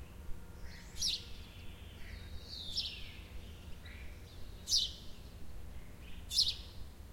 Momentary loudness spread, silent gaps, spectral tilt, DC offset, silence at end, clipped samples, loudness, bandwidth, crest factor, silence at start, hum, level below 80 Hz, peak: 21 LU; none; -1.5 dB/octave; under 0.1%; 0 s; under 0.1%; -35 LUFS; 16.5 kHz; 24 dB; 0 s; none; -52 dBFS; -18 dBFS